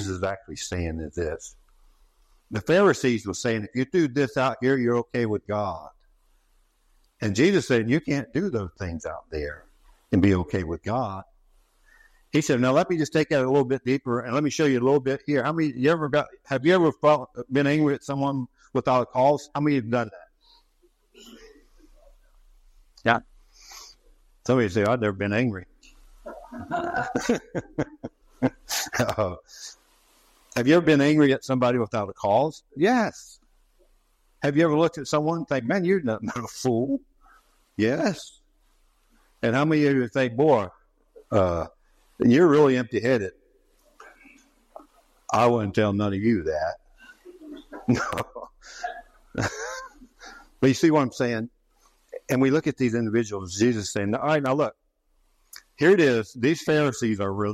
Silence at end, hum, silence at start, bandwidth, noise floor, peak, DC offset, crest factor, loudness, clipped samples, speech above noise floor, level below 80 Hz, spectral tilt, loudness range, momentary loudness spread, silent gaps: 0 s; none; 0 s; 14 kHz; -67 dBFS; -6 dBFS; under 0.1%; 20 dB; -24 LUFS; under 0.1%; 44 dB; -56 dBFS; -6 dB/octave; 7 LU; 16 LU; none